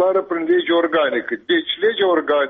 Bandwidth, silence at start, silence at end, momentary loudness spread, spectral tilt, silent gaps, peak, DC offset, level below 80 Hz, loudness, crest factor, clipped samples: 3.9 kHz; 0 s; 0 s; 4 LU; -0.5 dB/octave; none; -8 dBFS; under 0.1%; -64 dBFS; -18 LUFS; 10 dB; under 0.1%